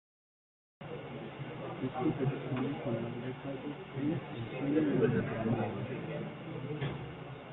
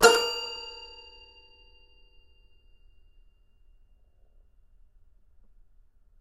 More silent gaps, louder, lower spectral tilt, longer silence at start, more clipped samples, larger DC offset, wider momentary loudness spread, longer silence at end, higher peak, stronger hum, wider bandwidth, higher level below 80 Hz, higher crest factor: neither; second, -36 LUFS vs -27 LUFS; first, -10.5 dB/octave vs -0.5 dB/octave; first, 0.8 s vs 0 s; neither; neither; second, 13 LU vs 29 LU; second, 0 s vs 5.35 s; second, -14 dBFS vs -2 dBFS; neither; second, 4.1 kHz vs 13 kHz; second, -64 dBFS vs -58 dBFS; second, 22 dB vs 30 dB